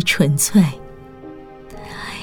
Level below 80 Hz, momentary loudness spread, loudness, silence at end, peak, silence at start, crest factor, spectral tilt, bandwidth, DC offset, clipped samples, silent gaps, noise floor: -44 dBFS; 24 LU; -16 LUFS; 0 s; -2 dBFS; 0 s; 16 dB; -4.5 dB/octave; over 20 kHz; under 0.1%; under 0.1%; none; -37 dBFS